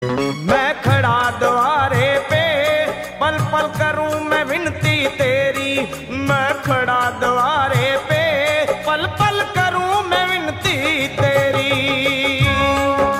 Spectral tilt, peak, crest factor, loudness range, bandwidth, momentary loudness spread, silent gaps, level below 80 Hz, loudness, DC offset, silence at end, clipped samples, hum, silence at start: -5 dB/octave; -4 dBFS; 14 dB; 2 LU; 16 kHz; 4 LU; none; -42 dBFS; -17 LUFS; under 0.1%; 0 s; under 0.1%; none; 0 s